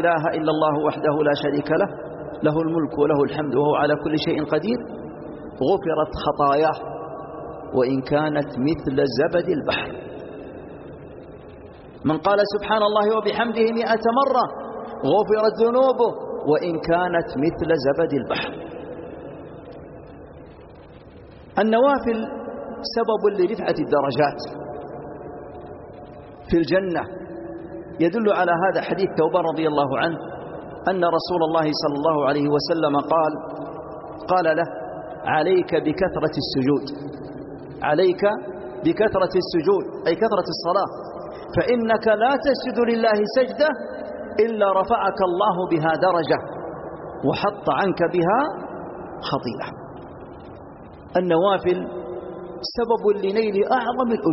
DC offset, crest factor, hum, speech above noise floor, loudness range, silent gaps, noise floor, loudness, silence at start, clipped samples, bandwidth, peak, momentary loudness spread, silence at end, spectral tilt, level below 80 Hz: under 0.1%; 16 dB; none; 23 dB; 5 LU; none; -43 dBFS; -21 LUFS; 0 s; under 0.1%; 6 kHz; -6 dBFS; 17 LU; 0 s; -4.5 dB/octave; -52 dBFS